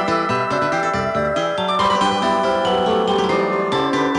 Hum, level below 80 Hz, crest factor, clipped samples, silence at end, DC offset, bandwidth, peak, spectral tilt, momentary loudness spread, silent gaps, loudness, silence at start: none; -48 dBFS; 12 dB; under 0.1%; 0 s; under 0.1%; 11 kHz; -6 dBFS; -5 dB/octave; 3 LU; none; -18 LUFS; 0 s